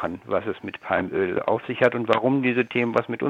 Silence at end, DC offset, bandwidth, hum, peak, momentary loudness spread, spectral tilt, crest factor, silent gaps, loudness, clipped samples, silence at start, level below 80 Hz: 0 s; under 0.1%; 8.2 kHz; none; -4 dBFS; 6 LU; -7.5 dB/octave; 20 dB; none; -24 LUFS; under 0.1%; 0 s; -62 dBFS